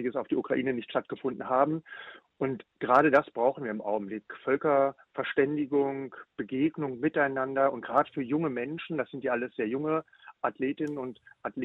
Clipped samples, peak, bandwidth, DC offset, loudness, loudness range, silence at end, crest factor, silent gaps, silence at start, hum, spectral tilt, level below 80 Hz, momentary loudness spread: under 0.1%; -8 dBFS; 6.8 kHz; under 0.1%; -29 LUFS; 4 LU; 0 s; 20 dB; none; 0 s; none; -8.5 dB/octave; -72 dBFS; 11 LU